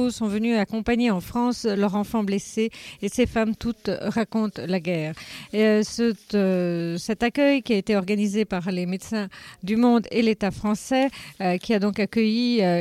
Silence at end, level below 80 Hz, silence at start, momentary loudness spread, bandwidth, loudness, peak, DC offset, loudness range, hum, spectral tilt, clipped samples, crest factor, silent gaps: 0 s; -50 dBFS; 0 s; 8 LU; 14.5 kHz; -24 LUFS; -8 dBFS; under 0.1%; 3 LU; none; -6 dB/octave; under 0.1%; 14 dB; none